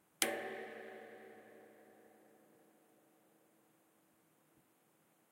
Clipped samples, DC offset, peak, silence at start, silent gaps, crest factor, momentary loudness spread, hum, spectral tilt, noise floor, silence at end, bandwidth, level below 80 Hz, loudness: under 0.1%; under 0.1%; -10 dBFS; 0.2 s; none; 40 dB; 27 LU; none; -0.5 dB/octave; -74 dBFS; 2.6 s; 16 kHz; under -90 dBFS; -42 LUFS